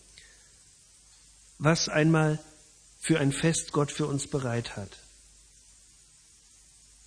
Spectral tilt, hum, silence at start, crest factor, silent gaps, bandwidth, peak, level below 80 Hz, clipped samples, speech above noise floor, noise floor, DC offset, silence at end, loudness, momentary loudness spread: -5 dB/octave; none; 1.6 s; 24 dB; none; 10.5 kHz; -8 dBFS; -58 dBFS; under 0.1%; 31 dB; -58 dBFS; under 0.1%; 2.1 s; -27 LUFS; 15 LU